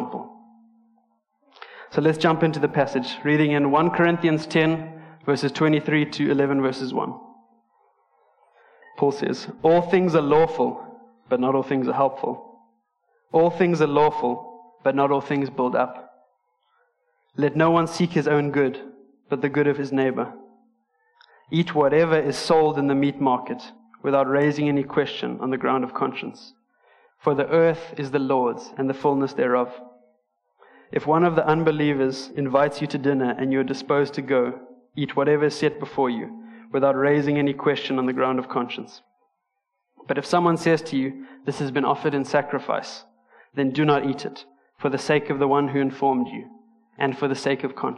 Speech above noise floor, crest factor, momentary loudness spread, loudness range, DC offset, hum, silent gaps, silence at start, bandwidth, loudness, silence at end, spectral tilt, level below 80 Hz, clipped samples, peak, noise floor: 56 dB; 18 dB; 11 LU; 4 LU; under 0.1%; none; none; 0 s; 11 kHz; -22 LUFS; 0 s; -6.5 dB/octave; -64 dBFS; under 0.1%; -4 dBFS; -78 dBFS